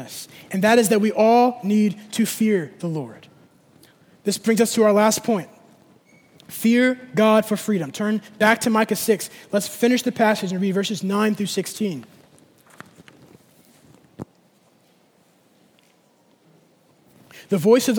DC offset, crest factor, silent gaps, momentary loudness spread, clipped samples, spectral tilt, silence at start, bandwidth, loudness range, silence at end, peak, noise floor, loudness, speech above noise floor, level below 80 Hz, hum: under 0.1%; 20 dB; none; 13 LU; under 0.1%; -4.5 dB/octave; 0 s; over 20 kHz; 8 LU; 0 s; -2 dBFS; -59 dBFS; -20 LUFS; 39 dB; -70 dBFS; none